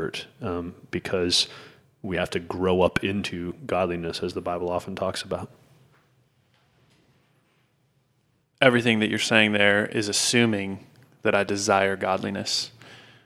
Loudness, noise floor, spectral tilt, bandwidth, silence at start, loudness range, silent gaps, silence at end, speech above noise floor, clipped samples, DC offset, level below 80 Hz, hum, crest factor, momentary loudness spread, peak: -24 LUFS; -68 dBFS; -3.5 dB/octave; 15.5 kHz; 0 s; 12 LU; none; 0.25 s; 44 dB; under 0.1%; under 0.1%; -56 dBFS; none; 26 dB; 14 LU; 0 dBFS